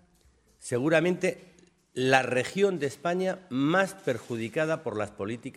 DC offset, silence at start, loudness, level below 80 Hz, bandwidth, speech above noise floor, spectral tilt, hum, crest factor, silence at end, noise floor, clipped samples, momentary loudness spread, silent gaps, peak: under 0.1%; 0.6 s; -28 LUFS; -68 dBFS; 15 kHz; 36 dB; -5.5 dB/octave; none; 22 dB; 0.05 s; -63 dBFS; under 0.1%; 10 LU; none; -6 dBFS